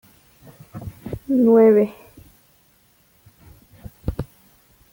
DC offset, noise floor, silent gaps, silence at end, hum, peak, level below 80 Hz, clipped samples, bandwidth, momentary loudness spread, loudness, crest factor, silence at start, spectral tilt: under 0.1%; -58 dBFS; none; 0.7 s; none; -4 dBFS; -44 dBFS; under 0.1%; 17 kHz; 24 LU; -17 LUFS; 18 dB; 0.75 s; -9 dB/octave